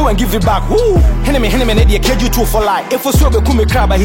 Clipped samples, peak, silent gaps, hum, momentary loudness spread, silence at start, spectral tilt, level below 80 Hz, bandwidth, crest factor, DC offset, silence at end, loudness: under 0.1%; -2 dBFS; none; none; 3 LU; 0 s; -5.5 dB/octave; -14 dBFS; 16.5 kHz; 10 dB; under 0.1%; 0 s; -12 LUFS